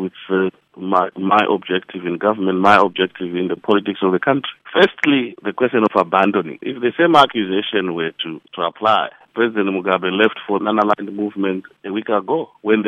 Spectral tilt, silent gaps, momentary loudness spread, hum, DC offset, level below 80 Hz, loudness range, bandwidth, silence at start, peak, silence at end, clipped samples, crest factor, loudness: -6.5 dB/octave; none; 11 LU; none; under 0.1%; -64 dBFS; 3 LU; 10 kHz; 0 s; 0 dBFS; 0 s; under 0.1%; 18 dB; -18 LUFS